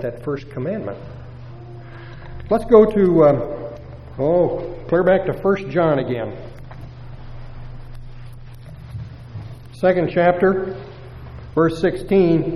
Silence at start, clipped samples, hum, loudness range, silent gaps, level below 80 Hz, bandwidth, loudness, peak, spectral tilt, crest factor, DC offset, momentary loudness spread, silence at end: 0 s; under 0.1%; none; 12 LU; none; -38 dBFS; 12 kHz; -18 LUFS; 0 dBFS; -8.5 dB/octave; 20 dB; under 0.1%; 23 LU; 0 s